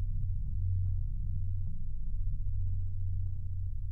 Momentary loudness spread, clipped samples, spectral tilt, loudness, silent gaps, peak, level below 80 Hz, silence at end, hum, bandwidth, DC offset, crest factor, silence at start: 6 LU; under 0.1%; -11.5 dB/octave; -38 LUFS; none; -22 dBFS; -34 dBFS; 0 s; none; 0.4 kHz; under 0.1%; 8 dB; 0 s